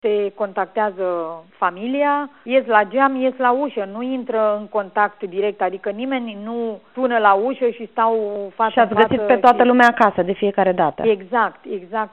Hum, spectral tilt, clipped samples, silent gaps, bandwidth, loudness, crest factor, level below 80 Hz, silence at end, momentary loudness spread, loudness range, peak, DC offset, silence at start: none; -3 dB/octave; under 0.1%; none; 4.8 kHz; -19 LUFS; 18 dB; -62 dBFS; 0.05 s; 12 LU; 5 LU; 0 dBFS; 0.2%; 0.05 s